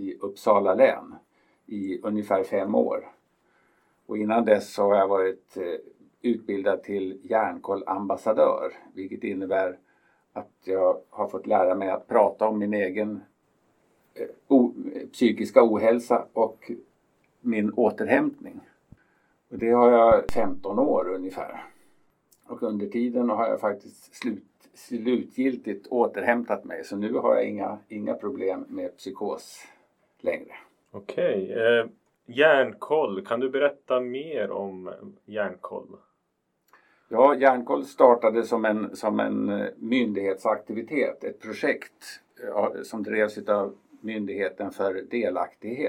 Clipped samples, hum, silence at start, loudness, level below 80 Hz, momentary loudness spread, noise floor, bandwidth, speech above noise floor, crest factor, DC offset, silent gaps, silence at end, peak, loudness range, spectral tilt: under 0.1%; none; 0 s; -25 LUFS; -60 dBFS; 16 LU; -75 dBFS; 14 kHz; 51 dB; 24 dB; under 0.1%; none; 0 s; -2 dBFS; 6 LU; -6 dB/octave